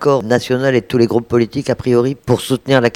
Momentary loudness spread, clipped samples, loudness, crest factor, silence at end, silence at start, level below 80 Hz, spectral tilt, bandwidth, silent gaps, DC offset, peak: 3 LU; under 0.1%; -15 LUFS; 14 dB; 0 s; 0 s; -46 dBFS; -6.5 dB/octave; 16.5 kHz; none; under 0.1%; 0 dBFS